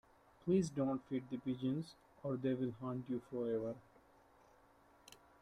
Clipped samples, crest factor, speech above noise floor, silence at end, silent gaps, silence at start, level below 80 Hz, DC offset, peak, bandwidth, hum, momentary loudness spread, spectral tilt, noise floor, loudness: under 0.1%; 18 dB; 29 dB; 0.25 s; none; 0.45 s; -74 dBFS; under 0.1%; -24 dBFS; 11.5 kHz; none; 17 LU; -7.5 dB/octave; -68 dBFS; -41 LUFS